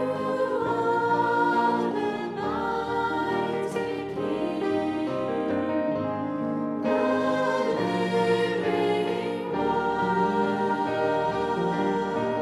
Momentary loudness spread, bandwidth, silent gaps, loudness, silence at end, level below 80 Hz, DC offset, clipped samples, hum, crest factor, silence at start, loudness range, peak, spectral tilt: 5 LU; 12.5 kHz; none; -26 LUFS; 0 s; -60 dBFS; under 0.1%; under 0.1%; none; 14 dB; 0 s; 3 LU; -12 dBFS; -6.5 dB/octave